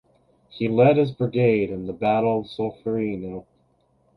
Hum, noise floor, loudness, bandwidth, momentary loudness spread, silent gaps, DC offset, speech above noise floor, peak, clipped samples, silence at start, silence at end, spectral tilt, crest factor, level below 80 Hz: none; -64 dBFS; -22 LUFS; 5.2 kHz; 12 LU; none; under 0.1%; 42 dB; -4 dBFS; under 0.1%; 0.55 s; 0.75 s; -9.5 dB/octave; 18 dB; -56 dBFS